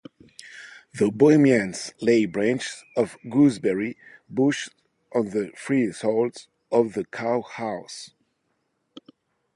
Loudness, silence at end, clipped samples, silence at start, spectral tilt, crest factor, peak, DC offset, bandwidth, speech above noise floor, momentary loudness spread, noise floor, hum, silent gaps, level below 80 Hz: -23 LUFS; 1.5 s; under 0.1%; 0.45 s; -6 dB/octave; 18 dB; -6 dBFS; under 0.1%; 11.5 kHz; 51 dB; 20 LU; -73 dBFS; none; none; -66 dBFS